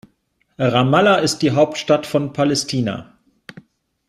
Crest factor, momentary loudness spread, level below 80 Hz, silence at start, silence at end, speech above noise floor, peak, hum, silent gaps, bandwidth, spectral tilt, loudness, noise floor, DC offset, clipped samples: 16 dB; 8 LU; -56 dBFS; 0.6 s; 1.05 s; 48 dB; -2 dBFS; none; none; 14 kHz; -5 dB/octave; -17 LUFS; -65 dBFS; under 0.1%; under 0.1%